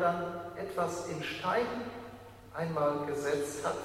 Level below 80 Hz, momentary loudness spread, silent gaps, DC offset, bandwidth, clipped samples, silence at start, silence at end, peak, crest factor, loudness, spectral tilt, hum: -64 dBFS; 13 LU; none; under 0.1%; 16 kHz; under 0.1%; 0 s; 0 s; -18 dBFS; 16 dB; -34 LUFS; -5 dB/octave; none